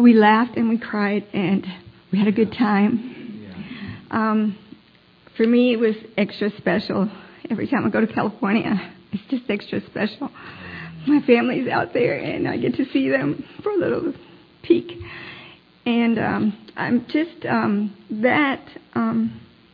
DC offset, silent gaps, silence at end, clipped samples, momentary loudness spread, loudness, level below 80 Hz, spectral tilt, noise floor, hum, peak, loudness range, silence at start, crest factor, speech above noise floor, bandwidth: under 0.1%; none; 0.35 s; under 0.1%; 17 LU; -21 LUFS; -60 dBFS; -9.5 dB/octave; -53 dBFS; none; -2 dBFS; 3 LU; 0 s; 18 dB; 33 dB; 5 kHz